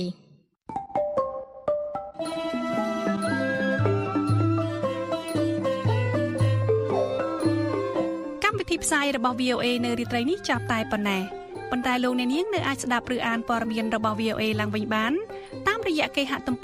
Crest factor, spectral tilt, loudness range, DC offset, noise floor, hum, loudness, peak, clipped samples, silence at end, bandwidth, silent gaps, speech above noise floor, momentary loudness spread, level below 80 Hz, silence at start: 20 dB; -5.5 dB/octave; 2 LU; under 0.1%; -58 dBFS; none; -26 LUFS; -6 dBFS; under 0.1%; 0 s; 15.5 kHz; none; 32 dB; 6 LU; -54 dBFS; 0 s